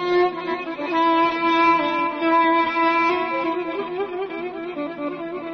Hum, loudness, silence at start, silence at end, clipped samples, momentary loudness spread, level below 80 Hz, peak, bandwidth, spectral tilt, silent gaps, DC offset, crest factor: none; -21 LUFS; 0 s; 0 s; under 0.1%; 12 LU; -60 dBFS; -8 dBFS; 6.4 kHz; -5.5 dB/octave; none; under 0.1%; 14 dB